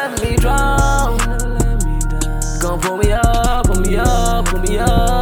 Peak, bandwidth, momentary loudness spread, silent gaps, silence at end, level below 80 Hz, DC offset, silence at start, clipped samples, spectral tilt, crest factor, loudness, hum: 0 dBFS; 17.5 kHz; 5 LU; none; 0 s; -16 dBFS; under 0.1%; 0 s; under 0.1%; -5 dB/octave; 14 dB; -17 LUFS; none